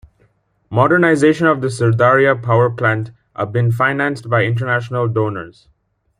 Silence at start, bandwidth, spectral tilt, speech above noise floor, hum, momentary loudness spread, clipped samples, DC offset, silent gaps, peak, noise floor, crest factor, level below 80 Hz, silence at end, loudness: 0.7 s; 11 kHz; -7 dB/octave; 43 dB; none; 10 LU; under 0.1%; under 0.1%; none; -2 dBFS; -58 dBFS; 16 dB; -54 dBFS; 0.7 s; -15 LUFS